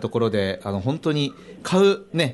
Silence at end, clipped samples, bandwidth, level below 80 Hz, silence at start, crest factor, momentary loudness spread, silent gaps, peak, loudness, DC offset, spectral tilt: 0 s; under 0.1%; 11.5 kHz; -60 dBFS; 0 s; 16 dB; 8 LU; none; -6 dBFS; -22 LUFS; under 0.1%; -6 dB/octave